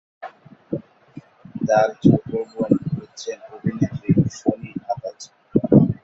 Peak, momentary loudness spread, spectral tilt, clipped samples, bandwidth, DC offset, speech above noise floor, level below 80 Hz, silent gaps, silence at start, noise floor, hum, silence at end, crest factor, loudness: -2 dBFS; 18 LU; -8 dB/octave; under 0.1%; 8 kHz; under 0.1%; 24 dB; -50 dBFS; none; 0.2 s; -44 dBFS; none; 0.1 s; 20 dB; -21 LUFS